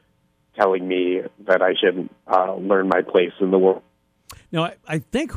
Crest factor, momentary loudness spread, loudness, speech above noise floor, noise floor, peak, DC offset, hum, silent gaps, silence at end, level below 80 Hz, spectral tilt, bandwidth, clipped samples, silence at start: 18 dB; 10 LU; -20 LUFS; 44 dB; -64 dBFS; -4 dBFS; under 0.1%; none; none; 0 s; -58 dBFS; -6 dB/octave; 13 kHz; under 0.1%; 0.55 s